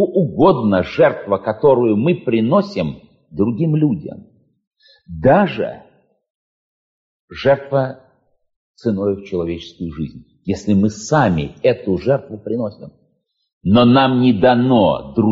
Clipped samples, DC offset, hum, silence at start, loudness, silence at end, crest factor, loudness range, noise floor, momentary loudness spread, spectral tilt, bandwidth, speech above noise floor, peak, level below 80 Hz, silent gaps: under 0.1%; under 0.1%; none; 0 s; -16 LUFS; 0 s; 14 dB; 7 LU; -66 dBFS; 13 LU; -6 dB/octave; 7.6 kHz; 50 dB; -2 dBFS; -46 dBFS; 4.67-4.71 s, 6.30-7.28 s, 8.56-8.74 s, 13.53-13.61 s